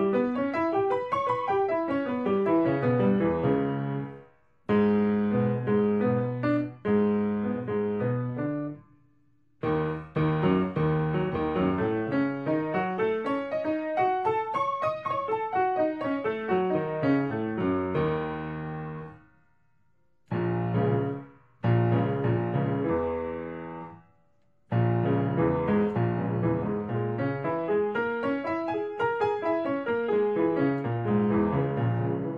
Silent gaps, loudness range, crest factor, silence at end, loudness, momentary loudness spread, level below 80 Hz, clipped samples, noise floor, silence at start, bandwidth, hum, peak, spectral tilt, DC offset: none; 4 LU; 14 dB; 0 s; -27 LUFS; 7 LU; -56 dBFS; under 0.1%; -72 dBFS; 0 s; 5.6 kHz; none; -12 dBFS; -10 dB/octave; under 0.1%